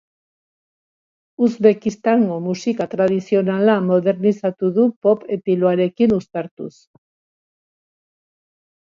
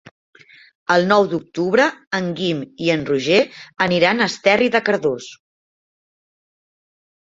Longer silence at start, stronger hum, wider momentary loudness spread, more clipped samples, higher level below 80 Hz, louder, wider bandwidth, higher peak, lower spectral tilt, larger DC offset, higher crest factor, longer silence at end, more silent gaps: first, 1.4 s vs 0.9 s; neither; about the same, 6 LU vs 8 LU; neither; about the same, -60 dBFS vs -60 dBFS; about the same, -18 LUFS vs -18 LUFS; about the same, 7.4 kHz vs 7.8 kHz; about the same, 0 dBFS vs -2 dBFS; first, -7.5 dB/octave vs -5 dB/octave; neither; about the same, 18 dB vs 18 dB; first, 2.2 s vs 1.9 s; first, 4.96-5.02 s, 6.51-6.57 s vs 2.07-2.11 s